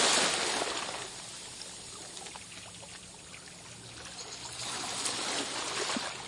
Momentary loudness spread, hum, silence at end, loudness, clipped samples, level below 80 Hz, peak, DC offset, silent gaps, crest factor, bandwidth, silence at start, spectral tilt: 16 LU; none; 0 s; -34 LUFS; under 0.1%; -66 dBFS; -14 dBFS; under 0.1%; none; 22 dB; 11.5 kHz; 0 s; -0.5 dB/octave